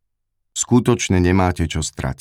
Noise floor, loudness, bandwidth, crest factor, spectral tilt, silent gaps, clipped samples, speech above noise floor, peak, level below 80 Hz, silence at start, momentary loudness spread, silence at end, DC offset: -72 dBFS; -18 LUFS; 15 kHz; 16 dB; -5 dB/octave; none; under 0.1%; 55 dB; -2 dBFS; -36 dBFS; 0.55 s; 8 LU; 0.05 s; under 0.1%